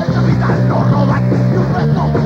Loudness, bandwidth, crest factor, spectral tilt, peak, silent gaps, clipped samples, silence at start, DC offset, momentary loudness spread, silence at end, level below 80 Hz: -13 LUFS; 6.8 kHz; 10 dB; -9 dB/octave; -2 dBFS; none; under 0.1%; 0 s; under 0.1%; 1 LU; 0 s; -32 dBFS